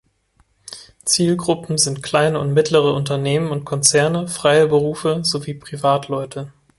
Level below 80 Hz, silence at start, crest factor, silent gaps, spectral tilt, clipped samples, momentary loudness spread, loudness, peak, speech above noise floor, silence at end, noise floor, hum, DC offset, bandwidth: -54 dBFS; 0.65 s; 18 dB; none; -4 dB/octave; under 0.1%; 12 LU; -18 LUFS; 0 dBFS; 43 dB; 0.3 s; -60 dBFS; none; under 0.1%; 12 kHz